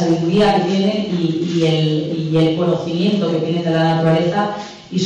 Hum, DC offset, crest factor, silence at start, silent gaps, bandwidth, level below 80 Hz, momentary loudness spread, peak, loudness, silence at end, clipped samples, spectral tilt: none; under 0.1%; 10 dB; 0 s; none; 8.4 kHz; -52 dBFS; 5 LU; -6 dBFS; -17 LUFS; 0 s; under 0.1%; -7 dB/octave